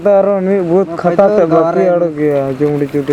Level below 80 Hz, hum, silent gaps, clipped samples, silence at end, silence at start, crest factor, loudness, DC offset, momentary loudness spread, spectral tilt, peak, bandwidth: -50 dBFS; none; none; under 0.1%; 0 s; 0 s; 12 dB; -12 LUFS; under 0.1%; 4 LU; -9 dB/octave; 0 dBFS; 10 kHz